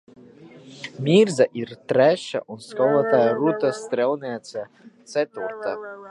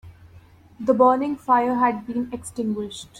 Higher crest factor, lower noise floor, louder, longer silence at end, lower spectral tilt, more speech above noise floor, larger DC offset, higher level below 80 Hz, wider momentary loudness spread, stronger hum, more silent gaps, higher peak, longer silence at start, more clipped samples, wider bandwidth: about the same, 18 dB vs 18 dB; about the same, -46 dBFS vs -49 dBFS; about the same, -22 LUFS vs -22 LUFS; about the same, 0 s vs 0 s; about the same, -6 dB/octave vs -5.5 dB/octave; second, 24 dB vs 28 dB; neither; second, -72 dBFS vs -58 dBFS; first, 16 LU vs 11 LU; neither; neither; about the same, -4 dBFS vs -4 dBFS; first, 0.4 s vs 0.05 s; neither; second, 11.5 kHz vs 13 kHz